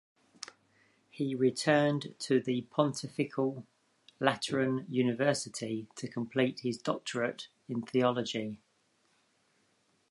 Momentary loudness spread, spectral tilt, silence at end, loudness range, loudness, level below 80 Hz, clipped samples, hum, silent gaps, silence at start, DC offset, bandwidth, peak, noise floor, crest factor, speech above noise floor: 12 LU; -5 dB/octave; 1.55 s; 3 LU; -32 LUFS; -78 dBFS; under 0.1%; none; none; 0.4 s; under 0.1%; 11.5 kHz; -8 dBFS; -73 dBFS; 26 dB; 41 dB